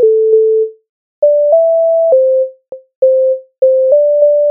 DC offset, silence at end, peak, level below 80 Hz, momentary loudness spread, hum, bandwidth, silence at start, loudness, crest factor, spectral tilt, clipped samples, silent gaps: under 0.1%; 0 s; 0 dBFS; -72 dBFS; 6 LU; none; 1.1 kHz; 0 s; -11 LUFS; 10 dB; -9 dB/octave; under 0.1%; 0.89-1.22 s, 2.95-3.02 s